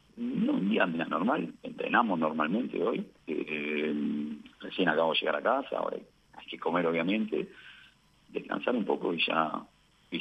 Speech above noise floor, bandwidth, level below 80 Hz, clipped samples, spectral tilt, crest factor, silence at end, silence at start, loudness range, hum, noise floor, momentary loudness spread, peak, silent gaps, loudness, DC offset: 30 dB; 8.4 kHz; -72 dBFS; under 0.1%; -7 dB/octave; 20 dB; 0 s; 0.15 s; 3 LU; none; -61 dBFS; 13 LU; -10 dBFS; none; -30 LUFS; under 0.1%